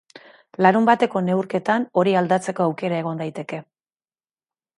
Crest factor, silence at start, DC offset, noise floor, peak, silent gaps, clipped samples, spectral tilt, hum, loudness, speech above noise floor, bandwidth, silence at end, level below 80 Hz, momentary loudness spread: 20 dB; 0.6 s; under 0.1%; under -90 dBFS; -2 dBFS; none; under 0.1%; -6.5 dB/octave; none; -20 LUFS; over 70 dB; 11 kHz; 1.15 s; -70 dBFS; 14 LU